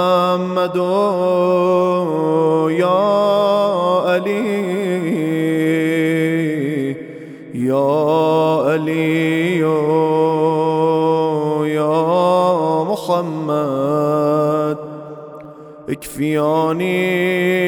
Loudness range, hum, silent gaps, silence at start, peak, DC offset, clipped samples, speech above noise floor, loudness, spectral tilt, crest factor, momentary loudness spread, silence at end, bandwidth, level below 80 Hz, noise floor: 4 LU; none; none; 0 s; -4 dBFS; under 0.1%; under 0.1%; 20 dB; -16 LUFS; -7 dB/octave; 12 dB; 8 LU; 0 s; 19 kHz; -62 dBFS; -36 dBFS